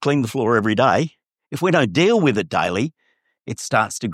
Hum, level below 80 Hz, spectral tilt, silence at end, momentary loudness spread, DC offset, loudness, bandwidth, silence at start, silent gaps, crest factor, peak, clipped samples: none; -60 dBFS; -5.5 dB/octave; 0 s; 12 LU; under 0.1%; -19 LUFS; 15.5 kHz; 0 s; none; 18 dB; -2 dBFS; under 0.1%